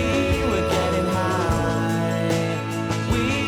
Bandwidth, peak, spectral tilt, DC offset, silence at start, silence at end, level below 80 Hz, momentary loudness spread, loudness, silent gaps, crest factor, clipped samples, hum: 16.5 kHz; -12 dBFS; -5.5 dB/octave; under 0.1%; 0 s; 0 s; -34 dBFS; 4 LU; -22 LUFS; none; 10 dB; under 0.1%; none